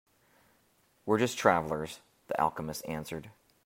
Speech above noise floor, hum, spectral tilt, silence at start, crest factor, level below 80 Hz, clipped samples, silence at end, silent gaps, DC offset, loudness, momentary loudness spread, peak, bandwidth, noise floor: 38 dB; none; -5 dB/octave; 1.05 s; 26 dB; -64 dBFS; under 0.1%; 0.35 s; none; under 0.1%; -31 LUFS; 17 LU; -6 dBFS; 16 kHz; -69 dBFS